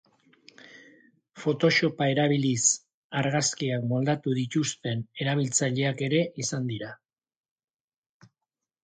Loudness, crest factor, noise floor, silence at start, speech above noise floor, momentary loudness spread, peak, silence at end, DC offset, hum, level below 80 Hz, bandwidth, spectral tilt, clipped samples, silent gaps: -26 LUFS; 20 dB; -88 dBFS; 0.75 s; 62 dB; 10 LU; -8 dBFS; 1.9 s; under 0.1%; none; -68 dBFS; 9.6 kHz; -4 dB/octave; under 0.1%; 2.94-3.10 s